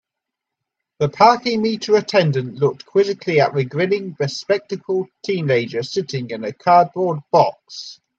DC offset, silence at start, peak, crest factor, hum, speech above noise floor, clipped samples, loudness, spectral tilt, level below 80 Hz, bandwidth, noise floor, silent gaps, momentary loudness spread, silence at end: under 0.1%; 1 s; 0 dBFS; 18 dB; none; 64 dB; under 0.1%; -18 LUFS; -6 dB/octave; -64 dBFS; 7.8 kHz; -83 dBFS; none; 10 LU; 0.25 s